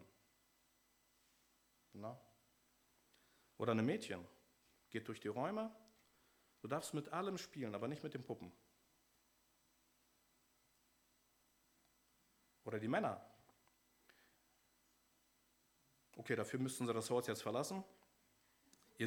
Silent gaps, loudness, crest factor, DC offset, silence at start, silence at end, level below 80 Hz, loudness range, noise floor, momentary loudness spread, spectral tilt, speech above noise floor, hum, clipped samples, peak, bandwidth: none; -44 LUFS; 24 dB; under 0.1%; 0 s; 0 s; -88 dBFS; 12 LU; -78 dBFS; 16 LU; -5 dB/octave; 35 dB; none; under 0.1%; -24 dBFS; over 20 kHz